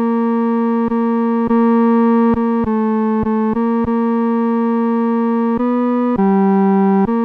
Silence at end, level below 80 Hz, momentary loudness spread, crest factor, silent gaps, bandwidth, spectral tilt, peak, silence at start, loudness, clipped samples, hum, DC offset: 0 s; -44 dBFS; 4 LU; 8 dB; none; 4.1 kHz; -10.5 dB/octave; -6 dBFS; 0 s; -15 LUFS; under 0.1%; none; under 0.1%